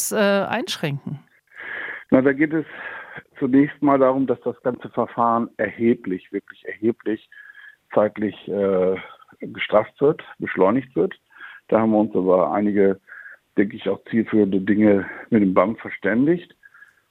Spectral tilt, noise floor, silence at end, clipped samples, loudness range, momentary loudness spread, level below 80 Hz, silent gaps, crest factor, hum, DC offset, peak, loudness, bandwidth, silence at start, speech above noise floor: -6 dB/octave; -51 dBFS; 0.65 s; under 0.1%; 4 LU; 15 LU; -62 dBFS; none; 20 dB; none; under 0.1%; -2 dBFS; -21 LUFS; 16 kHz; 0 s; 31 dB